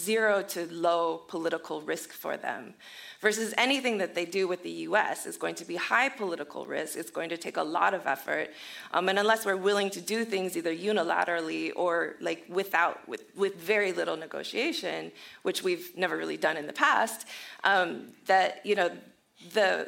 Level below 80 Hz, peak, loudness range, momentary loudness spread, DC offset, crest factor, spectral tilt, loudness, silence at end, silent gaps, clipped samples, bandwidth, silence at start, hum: -86 dBFS; -8 dBFS; 3 LU; 10 LU; under 0.1%; 22 dB; -3 dB/octave; -29 LUFS; 0 s; none; under 0.1%; 16.5 kHz; 0 s; none